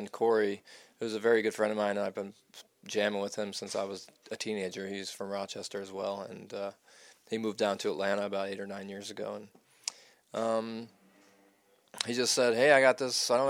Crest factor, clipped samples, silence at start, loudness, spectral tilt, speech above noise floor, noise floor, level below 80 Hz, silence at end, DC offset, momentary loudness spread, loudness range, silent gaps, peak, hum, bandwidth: 26 dB; under 0.1%; 0 s; -32 LUFS; -3 dB/octave; 35 dB; -67 dBFS; -84 dBFS; 0 s; under 0.1%; 15 LU; 9 LU; none; -6 dBFS; none; 16.5 kHz